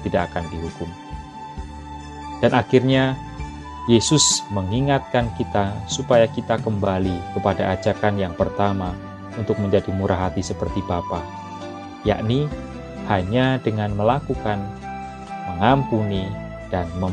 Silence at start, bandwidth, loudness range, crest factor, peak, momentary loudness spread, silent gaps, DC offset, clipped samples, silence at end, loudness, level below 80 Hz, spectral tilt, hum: 0 s; 12 kHz; 5 LU; 22 dB; 0 dBFS; 16 LU; none; under 0.1%; under 0.1%; 0 s; -21 LUFS; -38 dBFS; -5 dB/octave; none